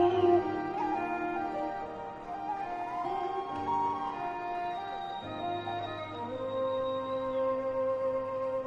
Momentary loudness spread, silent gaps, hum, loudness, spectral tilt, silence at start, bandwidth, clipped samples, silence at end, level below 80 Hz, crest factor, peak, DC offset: 7 LU; none; none; -33 LUFS; -7 dB/octave; 0 s; 7.6 kHz; under 0.1%; 0 s; -62 dBFS; 18 dB; -14 dBFS; under 0.1%